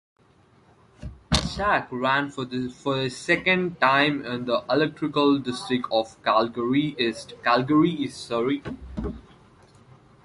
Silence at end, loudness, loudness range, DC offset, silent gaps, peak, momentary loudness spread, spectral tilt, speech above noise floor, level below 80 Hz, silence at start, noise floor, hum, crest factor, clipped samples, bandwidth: 1.05 s; -24 LUFS; 3 LU; under 0.1%; none; -4 dBFS; 12 LU; -5 dB/octave; 34 dB; -46 dBFS; 1 s; -58 dBFS; none; 22 dB; under 0.1%; 11.5 kHz